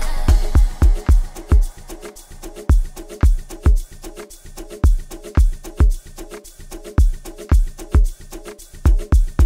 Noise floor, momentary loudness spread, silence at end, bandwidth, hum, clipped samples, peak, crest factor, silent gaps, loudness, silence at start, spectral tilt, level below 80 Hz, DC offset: -36 dBFS; 19 LU; 0 s; 15.5 kHz; none; under 0.1%; -2 dBFS; 14 dB; none; -20 LUFS; 0 s; -6.5 dB/octave; -18 dBFS; under 0.1%